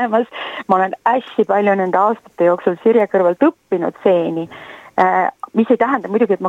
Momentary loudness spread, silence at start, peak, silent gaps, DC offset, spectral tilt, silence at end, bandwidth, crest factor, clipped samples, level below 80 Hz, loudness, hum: 8 LU; 0 s; 0 dBFS; none; under 0.1%; -7.5 dB/octave; 0 s; 8 kHz; 16 dB; under 0.1%; -66 dBFS; -16 LUFS; none